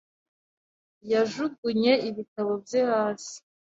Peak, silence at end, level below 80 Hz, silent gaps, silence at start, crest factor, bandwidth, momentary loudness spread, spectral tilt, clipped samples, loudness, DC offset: -8 dBFS; 0.4 s; -72 dBFS; 1.58-1.63 s, 2.28-2.36 s; 1.05 s; 20 dB; 8 kHz; 13 LU; -4.5 dB/octave; under 0.1%; -26 LUFS; under 0.1%